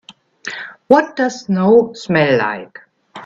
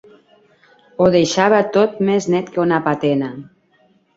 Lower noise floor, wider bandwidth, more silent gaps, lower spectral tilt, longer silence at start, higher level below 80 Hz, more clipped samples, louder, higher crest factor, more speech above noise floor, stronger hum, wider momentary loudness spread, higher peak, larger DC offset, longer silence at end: second, -33 dBFS vs -57 dBFS; about the same, 7.6 kHz vs 7.8 kHz; neither; about the same, -6 dB/octave vs -5.5 dB/octave; second, 0.1 s vs 1 s; about the same, -58 dBFS vs -56 dBFS; neither; about the same, -15 LUFS vs -16 LUFS; about the same, 16 dB vs 16 dB; second, 19 dB vs 41 dB; neither; first, 16 LU vs 10 LU; about the same, 0 dBFS vs -2 dBFS; neither; second, 0 s vs 0.75 s